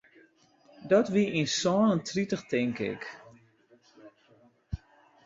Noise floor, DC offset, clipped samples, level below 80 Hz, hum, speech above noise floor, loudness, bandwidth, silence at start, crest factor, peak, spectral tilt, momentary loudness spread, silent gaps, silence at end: -63 dBFS; under 0.1%; under 0.1%; -54 dBFS; none; 35 dB; -28 LUFS; 7.8 kHz; 0.8 s; 20 dB; -10 dBFS; -5 dB/octave; 18 LU; none; 0.5 s